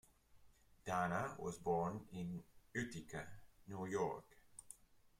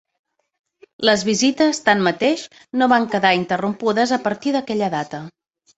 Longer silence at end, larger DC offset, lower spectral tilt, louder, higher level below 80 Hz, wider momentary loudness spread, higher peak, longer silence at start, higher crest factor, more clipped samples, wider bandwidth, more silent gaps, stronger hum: second, 0.15 s vs 0.5 s; neither; first, -6 dB/octave vs -4 dB/octave; second, -45 LUFS vs -19 LUFS; second, -70 dBFS vs -62 dBFS; first, 19 LU vs 9 LU; second, -28 dBFS vs -2 dBFS; second, 0.35 s vs 1 s; about the same, 18 dB vs 18 dB; neither; first, 16 kHz vs 8.2 kHz; neither; neither